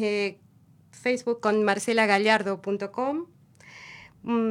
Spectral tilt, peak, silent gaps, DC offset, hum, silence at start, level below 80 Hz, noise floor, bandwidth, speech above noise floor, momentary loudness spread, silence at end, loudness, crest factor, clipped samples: -4.5 dB/octave; -6 dBFS; none; under 0.1%; none; 0 s; -74 dBFS; -50 dBFS; 13 kHz; 25 dB; 23 LU; 0 s; -25 LUFS; 22 dB; under 0.1%